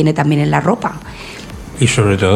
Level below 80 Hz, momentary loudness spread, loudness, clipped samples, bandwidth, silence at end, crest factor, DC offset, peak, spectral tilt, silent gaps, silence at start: -38 dBFS; 17 LU; -14 LUFS; under 0.1%; 13 kHz; 0 s; 14 dB; under 0.1%; 0 dBFS; -5.5 dB/octave; none; 0 s